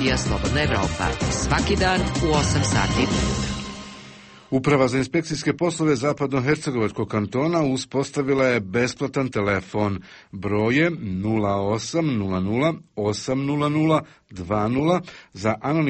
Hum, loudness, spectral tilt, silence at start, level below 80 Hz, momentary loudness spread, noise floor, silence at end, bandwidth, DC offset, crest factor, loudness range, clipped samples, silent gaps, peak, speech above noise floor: none; -22 LUFS; -5.5 dB/octave; 0 s; -38 dBFS; 7 LU; -44 dBFS; 0 s; 8.8 kHz; under 0.1%; 16 dB; 2 LU; under 0.1%; none; -8 dBFS; 22 dB